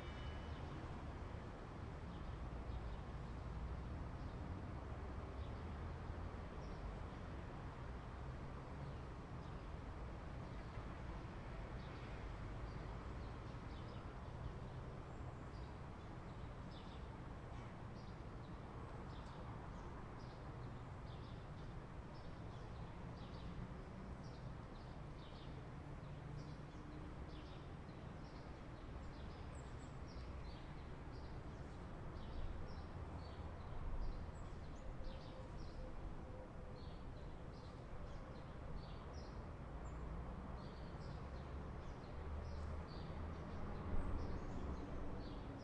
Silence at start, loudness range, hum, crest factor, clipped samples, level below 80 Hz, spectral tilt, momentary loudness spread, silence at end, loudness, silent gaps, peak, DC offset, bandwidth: 0 s; 3 LU; none; 20 dB; under 0.1%; -54 dBFS; -7 dB/octave; 4 LU; 0 s; -52 LUFS; none; -30 dBFS; under 0.1%; 10.5 kHz